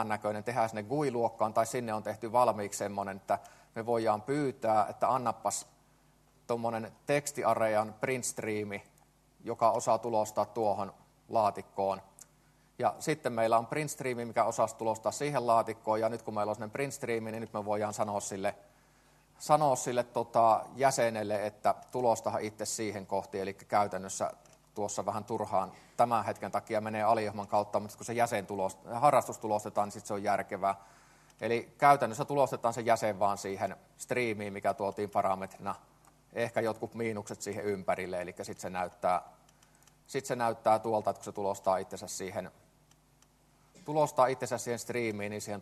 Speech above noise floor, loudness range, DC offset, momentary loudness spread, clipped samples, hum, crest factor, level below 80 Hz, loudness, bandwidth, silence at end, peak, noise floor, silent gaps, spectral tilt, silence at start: 34 dB; 5 LU; under 0.1%; 10 LU; under 0.1%; none; 24 dB; -72 dBFS; -32 LUFS; 13 kHz; 0 s; -10 dBFS; -66 dBFS; none; -4.5 dB/octave; 0 s